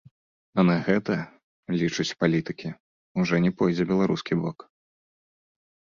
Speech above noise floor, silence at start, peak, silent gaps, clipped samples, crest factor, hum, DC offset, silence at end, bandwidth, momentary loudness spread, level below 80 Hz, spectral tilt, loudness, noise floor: over 66 dB; 0.55 s; -6 dBFS; 1.44-1.63 s, 2.80-3.15 s; under 0.1%; 20 dB; none; under 0.1%; 1.45 s; 7.4 kHz; 12 LU; -60 dBFS; -6.5 dB/octave; -25 LUFS; under -90 dBFS